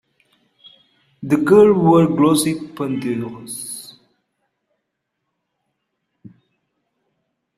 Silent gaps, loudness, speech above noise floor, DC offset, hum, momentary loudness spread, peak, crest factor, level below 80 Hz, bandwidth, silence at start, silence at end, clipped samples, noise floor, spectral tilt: none; -16 LUFS; 61 dB; under 0.1%; none; 18 LU; -2 dBFS; 18 dB; -58 dBFS; 15 kHz; 1.2 s; 3.75 s; under 0.1%; -76 dBFS; -6 dB/octave